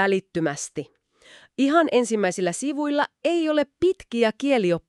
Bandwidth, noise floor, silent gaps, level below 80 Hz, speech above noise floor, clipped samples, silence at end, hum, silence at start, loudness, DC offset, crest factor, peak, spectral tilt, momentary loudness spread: 12 kHz; -52 dBFS; none; -62 dBFS; 30 dB; under 0.1%; 0.1 s; none; 0 s; -23 LUFS; under 0.1%; 18 dB; -6 dBFS; -4.5 dB/octave; 11 LU